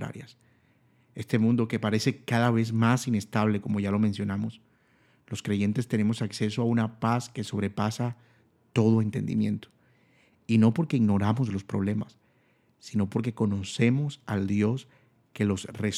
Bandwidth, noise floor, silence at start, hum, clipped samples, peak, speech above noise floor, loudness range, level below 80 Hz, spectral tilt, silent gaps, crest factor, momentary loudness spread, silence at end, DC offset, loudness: 13 kHz; -66 dBFS; 0 s; none; under 0.1%; -8 dBFS; 40 dB; 3 LU; -68 dBFS; -7 dB/octave; none; 20 dB; 10 LU; 0 s; under 0.1%; -27 LUFS